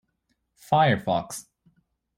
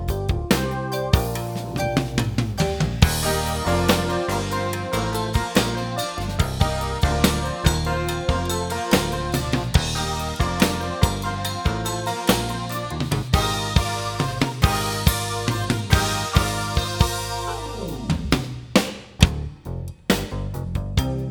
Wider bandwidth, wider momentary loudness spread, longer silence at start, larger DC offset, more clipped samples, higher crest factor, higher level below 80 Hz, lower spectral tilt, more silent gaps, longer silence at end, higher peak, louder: second, 16 kHz vs over 20 kHz; first, 17 LU vs 7 LU; first, 0.7 s vs 0 s; neither; neither; about the same, 20 dB vs 22 dB; second, -62 dBFS vs -30 dBFS; about the same, -5.5 dB/octave vs -4.5 dB/octave; neither; first, 0.75 s vs 0 s; second, -8 dBFS vs 0 dBFS; about the same, -23 LUFS vs -23 LUFS